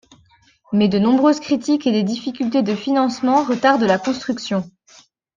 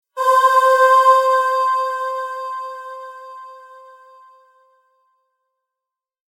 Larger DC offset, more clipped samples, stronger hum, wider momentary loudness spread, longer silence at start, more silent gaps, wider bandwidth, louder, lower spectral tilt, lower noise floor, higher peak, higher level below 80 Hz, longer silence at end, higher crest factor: neither; neither; neither; second, 8 LU vs 23 LU; first, 0.7 s vs 0.15 s; neither; second, 7.6 kHz vs 16.5 kHz; second, -18 LUFS vs -15 LUFS; first, -6 dB/octave vs 4 dB/octave; second, -55 dBFS vs -86 dBFS; about the same, -2 dBFS vs -2 dBFS; first, -60 dBFS vs under -90 dBFS; second, 0.65 s vs 2.8 s; about the same, 16 dB vs 16 dB